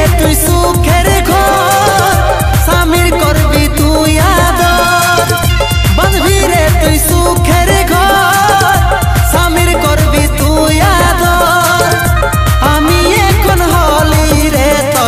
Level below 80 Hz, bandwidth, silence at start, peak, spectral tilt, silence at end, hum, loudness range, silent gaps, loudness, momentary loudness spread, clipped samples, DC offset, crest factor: -14 dBFS; 15.5 kHz; 0 s; 0 dBFS; -4.5 dB/octave; 0 s; none; 0 LU; none; -9 LUFS; 2 LU; under 0.1%; under 0.1%; 8 dB